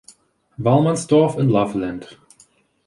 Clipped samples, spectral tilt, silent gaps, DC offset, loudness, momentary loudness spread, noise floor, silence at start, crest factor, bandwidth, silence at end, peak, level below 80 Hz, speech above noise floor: under 0.1%; -7 dB/octave; none; under 0.1%; -18 LUFS; 11 LU; -56 dBFS; 0.6 s; 16 dB; 11.5 kHz; 0.8 s; -4 dBFS; -54 dBFS; 38 dB